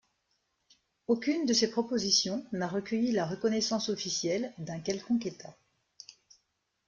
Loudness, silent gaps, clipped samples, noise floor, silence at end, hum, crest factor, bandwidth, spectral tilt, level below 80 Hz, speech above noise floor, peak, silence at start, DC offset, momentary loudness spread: -30 LUFS; none; under 0.1%; -79 dBFS; 1.35 s; none; 20 dB; 7.6 kHz; -3.5 dB/octave; -72 dBFS; 48 dB; -12 dBFS; 1.1 s; under 0.1%; 22 LU